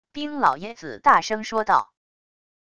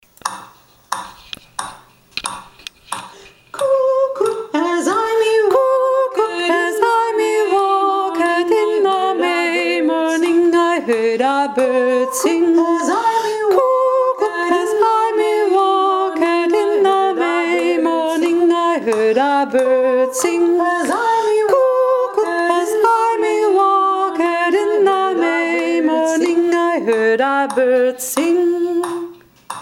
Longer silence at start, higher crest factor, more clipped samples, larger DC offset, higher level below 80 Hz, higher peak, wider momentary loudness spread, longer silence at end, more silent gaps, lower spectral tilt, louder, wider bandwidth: about the same, 0.15 s vs 0.25 s; about the same, 20 dB vs 16 dB; neither; neither; about the same, -60 dBFS vs -62 dBFS; second, -4 dBFS vs 0 dBFS; first, 14 LU vs 11 LU; first, 0.75 s vs 0 s; neither; about the same, -3.5 dB/octave vs -3 dB/octave; second, -21 LUFS vs -15 LUFS; second, 11 kHz vs 16 kHz